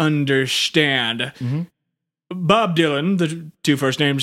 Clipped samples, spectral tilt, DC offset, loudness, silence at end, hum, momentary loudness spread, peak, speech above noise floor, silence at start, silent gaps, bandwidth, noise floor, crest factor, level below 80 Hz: under 0.1%; -5 dB/octave; under 0.1%; -19 LUFS; 0 s; none; 9 LU; -2 dBFS; 61 dB; 0 s; none; 16 kHz; -80 dBFS; 18 dB; -62 dBFS